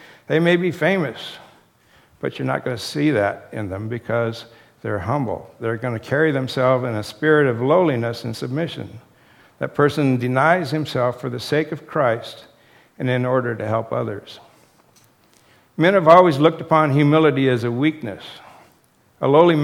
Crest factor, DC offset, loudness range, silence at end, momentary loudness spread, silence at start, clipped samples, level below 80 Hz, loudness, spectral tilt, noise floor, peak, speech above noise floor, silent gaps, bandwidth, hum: 20 dB; under 0.1%; 8 LU; 0 s; 14 LU; 0.3 s; under 0.1%; -60 dBFS; -19 LUFS; -7 dB/octave; -57 dBFS; 0 dBFS; 39 dB; none; 16 kHz; none